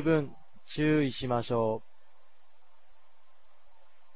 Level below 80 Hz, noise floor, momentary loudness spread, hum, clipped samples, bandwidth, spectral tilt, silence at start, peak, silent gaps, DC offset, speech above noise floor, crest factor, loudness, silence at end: -60 dBFS; -69 dBFS; 13 LU; none; under 0.1%; 4 kHz; -6 dB/octave; 0 s; -14 dBFS; none; 0.8%; 40 dB; 20 dB; -30 LUFS; 2.35 s